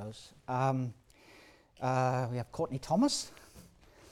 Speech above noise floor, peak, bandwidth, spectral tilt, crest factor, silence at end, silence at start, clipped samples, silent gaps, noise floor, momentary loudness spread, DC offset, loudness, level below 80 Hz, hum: 27 dB; -18 dBFS; 14 kHz; -5.5 dB/octave; 18 dB; 0.45 s; 0 s; under 0.1%; none; -59 dBFS; 16 LU; under 0.1%; -33 LUFS; -64 dBFS; none